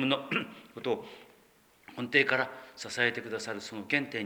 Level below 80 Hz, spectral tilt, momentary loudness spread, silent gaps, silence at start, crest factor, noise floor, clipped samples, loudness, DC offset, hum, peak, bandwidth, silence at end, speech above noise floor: -78 dBFS; -4 dB/octave; 16 LU; none; 0 s; 22 dB; -63 dBFS; under 0.1%; -31 LUFS; under 0.1%; none; -10 dBFS; over 20 kHz; 0 s; 31 dB